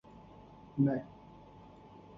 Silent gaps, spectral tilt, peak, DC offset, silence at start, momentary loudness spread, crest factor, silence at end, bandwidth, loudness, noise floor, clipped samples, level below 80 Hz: none; -9.5 dB/octave; -18 dBFS; under 0.1%; 0.75 s; 24 LU; 20 dB; 0 s; 5 kHz; -34 LUFS; -55 dBFS; under 0.1%; -66 dBFS